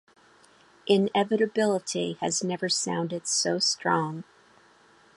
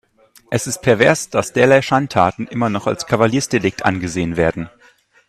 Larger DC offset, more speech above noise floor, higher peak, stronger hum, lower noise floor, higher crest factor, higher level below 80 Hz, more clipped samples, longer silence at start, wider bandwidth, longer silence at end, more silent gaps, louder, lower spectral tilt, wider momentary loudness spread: neither; second, 32 dB vs 36 dB; second, -8 dBFS vs 0 dBFS; neither; first, -58 dBFS vs -52 dBFS; about the same, 20 dB vs 18 dB; second, -74 dBFS vs -48 dBFS; neither; first, 0.85 s vs 0.5 s; second, 11.5 kHz vs 14.5 kHz; first, 0.95 s vs 0.6 s; neither; second, -26 LUFS vs -17 LUFS; second, -3.5 dB/octave vs -5 dB/octave; about the same, 7 LU vs 8 LU